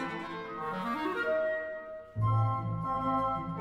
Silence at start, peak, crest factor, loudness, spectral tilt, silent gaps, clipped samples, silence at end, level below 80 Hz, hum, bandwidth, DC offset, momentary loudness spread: 0 s; -20 dBFS; 14 dB; -33 LUFS; -8 dB/octave; none; under 0.1%; 0 s; -56 dBFS; none; 7.4 kHz; under 0.1%; 10 LU